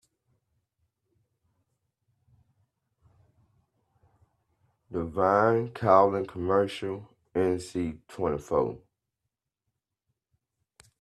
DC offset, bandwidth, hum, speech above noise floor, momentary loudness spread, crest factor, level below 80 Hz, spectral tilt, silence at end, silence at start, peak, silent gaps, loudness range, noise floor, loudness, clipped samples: under 0.1%; 12.5 kHz; none; 59 dB; 14 LU; 24 dB; -62 dBFS; -7 dB/octave; 2.25 s; 4.9 s; -6 dBFS; none; 9 LU; -86 dBFS; -27 LUFS; under 0.1%